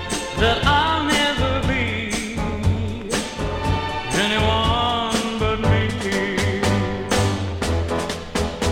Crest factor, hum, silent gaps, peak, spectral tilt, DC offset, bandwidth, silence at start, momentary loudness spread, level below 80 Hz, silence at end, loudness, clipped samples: 18 dB; none; none; -2 dBFS; -4.5 dB/octave; under 0.1%; 16.5 kHz; 0 s; 7 LU; -32 dBFS; 0 s; -21 LUFS; under 0.1%